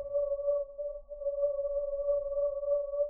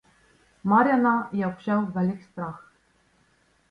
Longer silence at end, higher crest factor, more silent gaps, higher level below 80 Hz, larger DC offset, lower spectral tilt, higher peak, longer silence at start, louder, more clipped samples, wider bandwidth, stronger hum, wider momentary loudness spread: second, 0 s vs 1.1 s; second, 12 dB vs 20 dB; neither; first, -54 dBFS vs -64 dBFS; neither; second, -7.5 dB/octave vs -9 dB/octave; second, -22 dBFS vs -8 dBFS; second, 0 s vs 0.65 s; second, -33 LUFS vs -25 LUFS; neither; second, 1.2 kHz vs 5.2 kHz; neither; second, 7 LU vs 16 LU